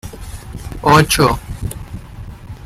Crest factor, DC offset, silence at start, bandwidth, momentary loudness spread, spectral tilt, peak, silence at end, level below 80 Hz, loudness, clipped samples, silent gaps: 18 dB; under 0.1%; 0.05 s; 16 kHz; 22 LU; -4.5 dB/octave; 0 dBFS; 0 s; -32 dBFS; -14 LUFS; under 0.1%; none